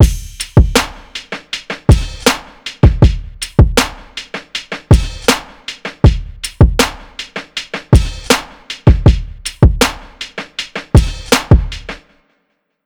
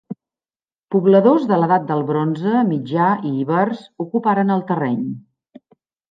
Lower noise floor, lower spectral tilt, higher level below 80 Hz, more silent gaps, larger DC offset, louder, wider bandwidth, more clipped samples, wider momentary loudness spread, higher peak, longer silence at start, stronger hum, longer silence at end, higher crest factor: second, -65 dBFS vs under -90 dBFS; second, -5 dB/octave vs -10 dB/octave; first, -18 dBFS vs -70 dBFS; second, none vs 0.79-0.83 s; neither; first, -14 LUFS vs -18 LUFS; first, 19.5 kHz vs 5.4 kHz; neither; first, 15 LU vs 12 LU; about the same, 0 dBFS vs -2 dBFS; about the same, 0 s vs 0.1 s; neither; about the same, 0.9 s vs 0.95 s; about the same, 12 dB vs 16 dB